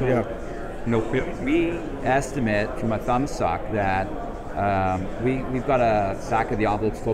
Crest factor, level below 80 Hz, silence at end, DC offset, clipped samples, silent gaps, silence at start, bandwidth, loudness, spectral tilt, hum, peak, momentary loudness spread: 14 dB; -36 dBFS; 0 s; under 0.1%; under 0.1%; none; 0 s; 15 kHz; -24 LUFS; -7 dB/octave; none; -8 dBFS; 7 LU